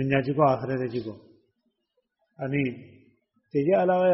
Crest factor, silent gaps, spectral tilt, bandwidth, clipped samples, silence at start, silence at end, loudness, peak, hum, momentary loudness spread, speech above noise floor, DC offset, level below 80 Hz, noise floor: 20 dB; none; -6.5 dB/octave; 5.8 kHz; under 0.1%; 0 s; 0 s; -26 LUFS; -8 dBFS; none; 14 LU; 52 dB; under 0.1%; -64 dBFS; -77 dBFS